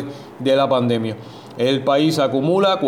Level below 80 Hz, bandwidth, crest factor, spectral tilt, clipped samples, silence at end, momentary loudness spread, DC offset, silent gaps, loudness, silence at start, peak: -62 dBFS; 16.5 kHz; 14 dB; -6 dB/octave; under 0.1%; 0 s; 14 LU; under 0.1%; none; -18 LUFS; 0 s; -6 dBFS